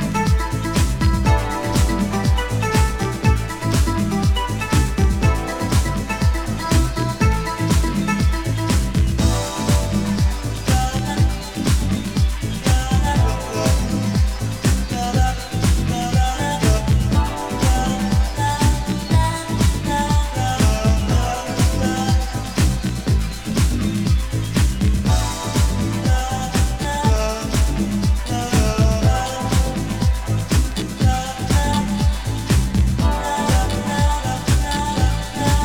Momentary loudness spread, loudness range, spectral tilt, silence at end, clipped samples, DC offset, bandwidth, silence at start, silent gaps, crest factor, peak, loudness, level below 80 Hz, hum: 3 LU; 1 LU; -5.5 dB/octave; 0 s; under 0.1%; under 0.1%; 18.5 kHz; 0 s; none; 14 dB; -4 dBFS; -20 LUFS; -22 dBFS; none